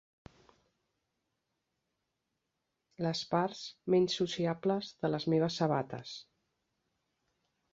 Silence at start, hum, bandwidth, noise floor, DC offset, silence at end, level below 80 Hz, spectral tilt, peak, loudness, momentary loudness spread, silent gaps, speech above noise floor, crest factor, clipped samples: 3 s; none; 8 kHz; -85 dBFS; under 0.1%; 1.5 s; -72 dBFS; -6 dB/octave; -16 dBFS; -33 LUFS; 12 LU; none; 53 dB; 20 dB; under 0.1%